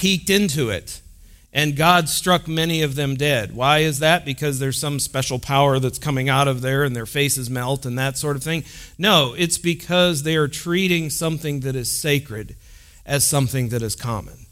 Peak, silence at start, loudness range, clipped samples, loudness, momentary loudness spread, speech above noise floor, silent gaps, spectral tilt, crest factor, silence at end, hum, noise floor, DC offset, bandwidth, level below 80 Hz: -2 dBFS; 0 s; 3 LU; under 0.1%; -20 LUFS; 9 LU; 26 dB; none; -4 dB/octave; 20 dB; 0.05 s; none; -46 dBFS; under 0.1%; 16.5 kHz; -46 dBFS